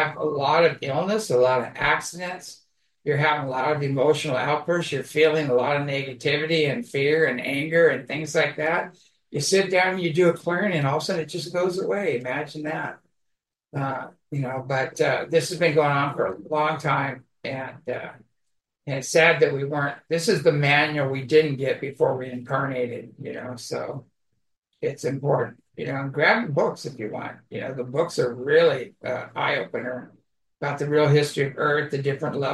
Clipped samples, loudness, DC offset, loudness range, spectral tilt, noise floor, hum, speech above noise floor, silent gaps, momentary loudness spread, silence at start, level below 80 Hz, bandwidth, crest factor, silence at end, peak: under 0.1%; -23 LUFS; under 0.1%; 6 LU; -5 dB/octave; -78 dBFS; none; 54 dB; 24.58-24.62 s; 13 LU; 0 s; -64 dBFS; 12.5 kHz; 20 dB; 0 s; -4 dBFS